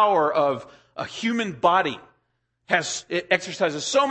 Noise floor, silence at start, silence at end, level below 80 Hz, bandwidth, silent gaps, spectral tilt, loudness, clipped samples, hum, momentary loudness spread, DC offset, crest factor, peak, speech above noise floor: -73 dBFS; 0 s; 0 s; -66 dBFS; 8.8 kHz; none; -3 dB/octave; -23 LUFS; under 0.1%; none; 13 LU; under 0.1%; 20 dB; -4 dBFS; 50 dB